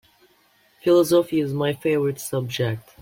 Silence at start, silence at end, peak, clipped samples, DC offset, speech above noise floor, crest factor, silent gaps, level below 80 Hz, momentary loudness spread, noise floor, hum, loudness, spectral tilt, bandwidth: 0.85 s; 0.2 s; -8 dBFS; under 0.1%; under 0.1%; 39 dB; 16 dB; none; -60 dBFS; 10 LU; -60 dBFS; none; -22 LUFS; -6 dB/octave; 16.5 kHz